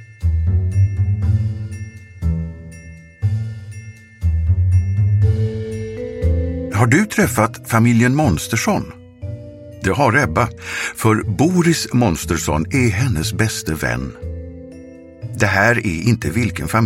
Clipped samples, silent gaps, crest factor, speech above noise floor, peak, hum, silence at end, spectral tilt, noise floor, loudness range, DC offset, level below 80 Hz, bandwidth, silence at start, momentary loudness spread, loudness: under 0.1%; none; 18 dB; 21 dB; 0 dBFS; none; 0 s; -6 dB/octave; -38 dBFS; 5 LU; under 0.1%; -30 dBFS; 16 kHz; 0 s; 18 LU; -18 LUFS